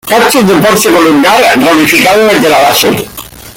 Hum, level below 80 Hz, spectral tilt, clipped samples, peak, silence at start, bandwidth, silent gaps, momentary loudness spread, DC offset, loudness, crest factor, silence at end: none; -40 dBFS; -3.5 dB/octave; 0.3%; 0 dBFS; 0.05 s; 17.5 kHz; none; 5 LU; under 0.1%; -5 LUFS; 6 dB; 0.05 s